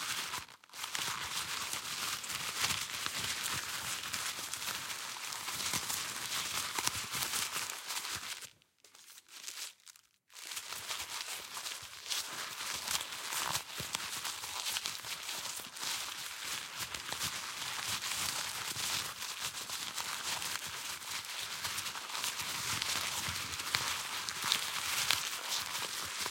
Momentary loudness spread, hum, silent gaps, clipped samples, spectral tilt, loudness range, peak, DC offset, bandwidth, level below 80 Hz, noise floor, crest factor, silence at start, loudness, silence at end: 7 LU; none; none; under 0.1%; 0.5 dB/octave; 6 LU; -10 dBFS; under 0.1%; 17 kHz; -70 dBFS; -63 dBFS; 30 dB; 0 s; -36 LUFS; 0 s